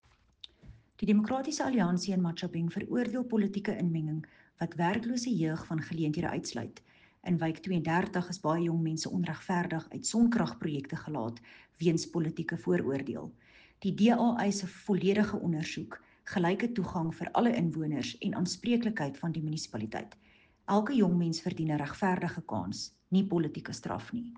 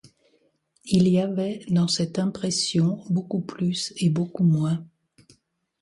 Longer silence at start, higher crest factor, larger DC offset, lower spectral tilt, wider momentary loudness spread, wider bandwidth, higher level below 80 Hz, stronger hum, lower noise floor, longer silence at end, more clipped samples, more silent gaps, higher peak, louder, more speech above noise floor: second, 0.65 s vs 0.85 s; about the same, 18 dB vs 18 dB; neither; about the same, -6 dB/octave vs -6 dB/octave; first, 12 LU vs 6 LU; second, 9.6 kHz vs 11.5 kHz; about the same, -64 dBFS vs -62 dBFS; neither; second, -56 dBFS vs -66 dBFS; second, 0 s vs 0.95 s; neither; neither; second, -14 dBFS vs -6 dBFS; second, -32 LUFS vs -24 LUFS; second, 25 dB vs 43 dB